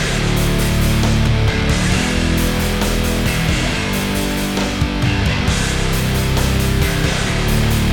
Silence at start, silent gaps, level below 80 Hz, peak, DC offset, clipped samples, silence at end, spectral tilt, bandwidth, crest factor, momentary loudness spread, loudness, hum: 0 s; none; -22 dBFS; -2 dBFS; under 0.1%; under 0.1%; 0 s; -4.5 dB/octave; over 20 kHz; 14 dB; 3 LU; -17 LUFS; none